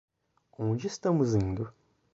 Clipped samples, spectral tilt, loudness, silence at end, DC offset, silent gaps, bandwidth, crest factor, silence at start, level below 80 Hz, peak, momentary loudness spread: under 0.1%; -7.5 dB/octave; -30 LUFS; 0.45 s; under 0.1%; none; 8 kHz; 18 dB; 0.6 s; -52 dBFS; -14 dBFS; 10 LU